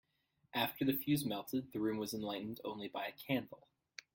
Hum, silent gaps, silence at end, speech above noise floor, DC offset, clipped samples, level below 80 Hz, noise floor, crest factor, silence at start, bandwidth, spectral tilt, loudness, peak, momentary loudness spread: none; none; 0.6 s; 40 dB; under 0.1%; under 0.1%; -76 dBFS; -79 dBFS; 22 dB; 0.55 s; 17 kHz; -5 dB/octave; -39 LUFS; -20 dBFS; 9 LU